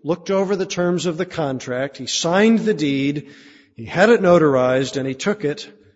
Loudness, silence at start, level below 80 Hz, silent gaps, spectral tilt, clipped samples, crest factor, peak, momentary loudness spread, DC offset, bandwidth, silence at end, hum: -19 LUFS; 0.05 s; -58 dBFS; none; -5 dB/octave; under 0.1%; 16 dB; -2 dBFS; 11 LU; under 0.1%; 8 kHz; 0.25 s; none